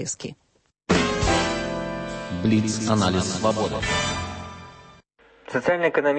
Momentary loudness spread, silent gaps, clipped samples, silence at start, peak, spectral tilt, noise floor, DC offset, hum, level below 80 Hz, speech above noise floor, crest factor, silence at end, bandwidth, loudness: 16 LU; none; under 0.1%; 0 s; -6 dBFS; -4.5 dB/octave; -55 dBFS; under 0.1%; none; -42 dBFS; 32 dB; 18 dB; 0 s; 8.8 kHz; -23 LUFS